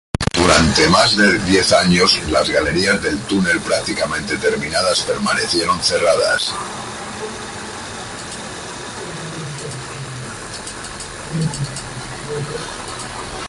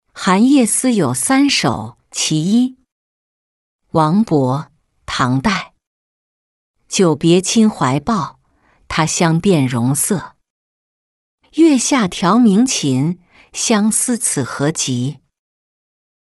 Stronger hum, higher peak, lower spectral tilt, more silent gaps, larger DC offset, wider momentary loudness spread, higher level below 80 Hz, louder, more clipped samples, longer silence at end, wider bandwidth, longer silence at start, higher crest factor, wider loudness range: neither; about the same, 0 dBFS vs -2 dBFS; about the same, -3.5 dB/octave vs -4.5 dB/octave; second, none vs 2.92-3.79 s, 5.87-6.74 s, 10.50-11.38 s; neither; first, 16 LU vs 10 LU; first, -38 dBFS vs -48 dBFS; about the same, -17 LUFS vs -15 LUFS; neither; second, 0 s vs 1.15 s; about the same, 11.5 kHz vs 12.5 kHz; about the same, 0.2 s vs 0.15 s; about the same, 18 dB vs 14 dB; first, 14 LU vs 4 LU